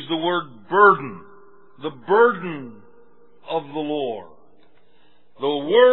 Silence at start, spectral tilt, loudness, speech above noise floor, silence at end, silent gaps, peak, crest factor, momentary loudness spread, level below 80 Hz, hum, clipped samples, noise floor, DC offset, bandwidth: 0 s; -9 dB/octave; -20 LUFS; 41 dB; 0 s; none; -2 dBFS; 20 dB; 20 LU; -78 dBFS; none; under 0.1%; -60 dBFS; 0.5%; 4.2 kHz